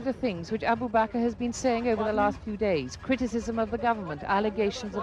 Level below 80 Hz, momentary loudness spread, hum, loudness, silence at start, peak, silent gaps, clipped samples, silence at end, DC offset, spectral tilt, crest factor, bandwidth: -50 dBFS; 5 LU; none; -28 LUFS; 0 s; -12 dBFS; none; under 0.1%; 0 s; under 0.1%; -5.5 dB/octave; 16 dB; 10.5 kHz